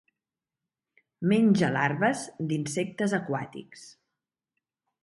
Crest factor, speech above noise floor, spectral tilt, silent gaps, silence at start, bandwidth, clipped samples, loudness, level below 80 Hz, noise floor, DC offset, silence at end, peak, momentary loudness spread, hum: 20 dB; 63 dB; -6 dB/octave; none; 1.2 s; 11.5 kHz; under 0.1%; -27 LUFS; -70 dBFS; -90 dBFS; under 0.1%; 1.15 s; -8 dBFS; 14 LU; none